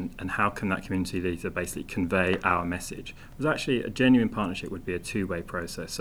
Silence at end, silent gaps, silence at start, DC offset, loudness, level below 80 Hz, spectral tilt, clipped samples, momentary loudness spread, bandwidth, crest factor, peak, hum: 0 s; none; 0 s; under 0.1%; -28 LUFS; -48 dBFS; -5.5 dB/octave; under 0.1%; 11 LU; 15.5 kHz; 22 dB; -6 dBFS; none